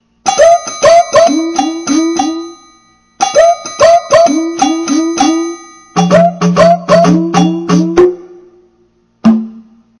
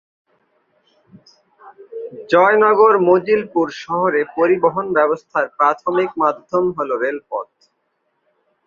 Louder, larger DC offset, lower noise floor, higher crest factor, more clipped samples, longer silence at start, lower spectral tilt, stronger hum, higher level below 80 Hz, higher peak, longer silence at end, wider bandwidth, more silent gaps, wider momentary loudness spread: first, -9 LUFS vs -16 LUFS; neither; second, -52 dBFS vs -69 dBFS; second, 10 dB vs 16 dB; first, 0.4% vs under 0.1%; second, 0.25 s vs 1.65 s; second, -5 dB/octave vs -7 dB/octave; neither; first, -44 dBFS vs -64 dBFS; about the same, 0 dBFS vs -2 dBFS; second, 0.4 s vs 1.2 s; first, 11 kHz vs 7 kHz; neither; second, 9 LU vs 16 LU